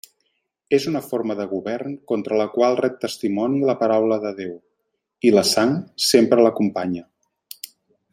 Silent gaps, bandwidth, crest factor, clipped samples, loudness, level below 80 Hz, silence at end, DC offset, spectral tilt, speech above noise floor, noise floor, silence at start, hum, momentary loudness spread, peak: none; 16.5 kHz; 20 dB; under 0.1%; -20 LUFS; -68 dBFS; 0.45 s; under 0.1%; -4.5 dB/octave; 56 dB; -75 dBFS; 0.7 s; none; 14 LU; -2 dBFS